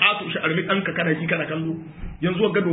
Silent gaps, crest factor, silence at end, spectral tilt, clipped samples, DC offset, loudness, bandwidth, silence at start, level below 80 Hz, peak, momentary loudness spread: none; 20 dB; 0 s; -10.5 dB/octave; under 0.1%; under 0.1%; -23 LUFS; 4 kHz; 0 s; -46 dBFS; -2 dBFS; 8 LU